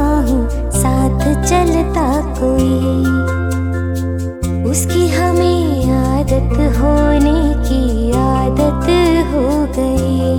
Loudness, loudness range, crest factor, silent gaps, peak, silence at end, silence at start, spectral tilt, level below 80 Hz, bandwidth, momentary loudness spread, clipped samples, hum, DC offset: -14 LUFS; 2 LU; 12 dB; none; 0 dBFS; 0 s; 0 s; -6.5 dB/octave; -20 dBFS; 17.5 kHz; 5 LU; under 0.1%; none; 0.2%